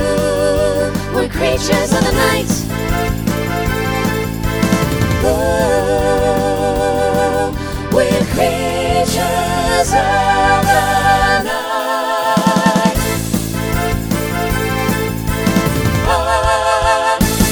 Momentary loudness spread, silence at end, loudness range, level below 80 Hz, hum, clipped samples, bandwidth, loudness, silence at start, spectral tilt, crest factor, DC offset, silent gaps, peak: 6 LU; 0 s; 3 LU; -26 dBFS; none; under 0.1%; over 20 kHz; -15 LUFS; 0 s; -5 dB/octave; 14 dB; under 0.1%; none; 0 dBFS